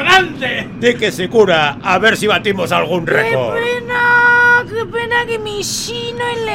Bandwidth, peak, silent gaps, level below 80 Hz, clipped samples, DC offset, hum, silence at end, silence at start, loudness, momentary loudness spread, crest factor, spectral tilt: 16.5 kHz; 0 dBFS; none; -44 dBFS; under 0.1%; under 0.1%; none; 0 s; 0 s; -14 LUFS; 10 LU; 14 dB; -3.5 dB/octave